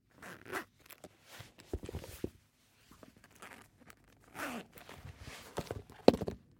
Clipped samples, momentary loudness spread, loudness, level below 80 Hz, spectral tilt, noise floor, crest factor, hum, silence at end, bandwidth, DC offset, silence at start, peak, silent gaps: under 0.1%; 29 LU; -38 LUFS; -58 dBFS; -5.5 dB/octave; -68 dBFS; 38 dB; none; 0.2 s; 17 kHz; under 0.1%; 0.2 s; -2 dBFS; none